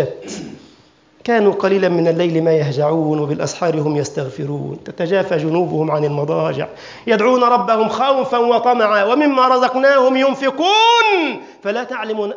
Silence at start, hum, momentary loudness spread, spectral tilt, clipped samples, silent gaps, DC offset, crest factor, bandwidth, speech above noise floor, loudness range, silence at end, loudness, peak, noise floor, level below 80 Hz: 0 s; none; 12 LU; -5.5 dB/octave; under 0.1%; none; under 0.1%; 14 dB; 7.6 kHz; 35 dB; 6 LU; 0 s; -16 LUFS; -2 dBFS; -50 dBFS; -60 dBFS